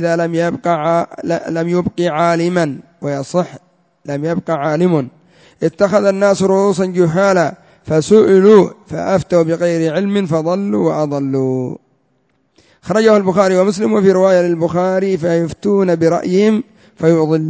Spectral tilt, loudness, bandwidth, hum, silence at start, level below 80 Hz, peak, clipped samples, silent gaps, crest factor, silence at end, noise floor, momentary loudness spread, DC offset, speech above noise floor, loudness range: -7 dB/octave; -14 LUFS; 8 kHz; none; 0 s; -52 dBFS; 0 dBFS; under 0.1%; none; 14 dB; 0 s; -61 dBFS; 10 LU; under 0.1%; 47 dB; 6 LU